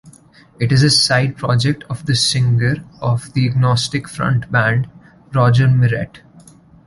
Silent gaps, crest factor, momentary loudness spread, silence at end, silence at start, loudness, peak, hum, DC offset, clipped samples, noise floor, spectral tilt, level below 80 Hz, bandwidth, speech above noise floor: none; 14 dB; 10 LU; 0.7 s; 0.05 s; -16 LUFS; -2 dBFS; none; under 0.1%; under 0.1%; -46 dBFS; -5 dB/octave; -46 dBFS; 11.5 kHz; 31 dB